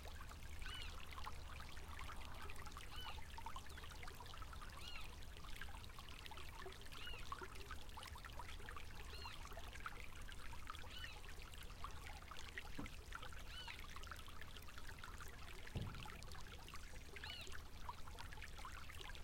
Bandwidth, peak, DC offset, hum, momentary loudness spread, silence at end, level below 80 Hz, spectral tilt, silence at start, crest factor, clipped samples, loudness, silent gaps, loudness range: 16.5 kHz; -32 dBFS; under 0.1%; none; 4 LU; 0 s; -56 dBFS; -3.5 dB/octave; 0 s; 18 dB; under 0.1%; -54 LUFS; none; 1 LU